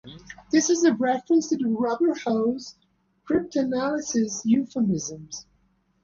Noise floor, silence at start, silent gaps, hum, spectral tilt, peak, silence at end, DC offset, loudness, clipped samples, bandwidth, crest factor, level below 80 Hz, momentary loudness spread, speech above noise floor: -66 dBFS; 0.05 s; none; none; -4.5 dB/octave; -8 dBFS; 0.6 s; under 0.1%; -24 LUFS; under 0.1%; 7.4 kHz; 16 dB; -60 dBFS; 17 LU; 43 dB